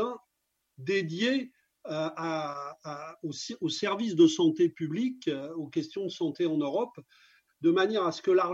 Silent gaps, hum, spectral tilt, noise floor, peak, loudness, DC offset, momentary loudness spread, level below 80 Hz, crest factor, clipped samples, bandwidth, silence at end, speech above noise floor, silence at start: none; none; -5 dB/octave; -80 dBFS; -10 dBFS; -30 LUFS; under 0.1%; 15 LU; -82 dBFS; 18 dB; under 0.1%; 7.8 kHz; 0 s; 51 dB; 0 s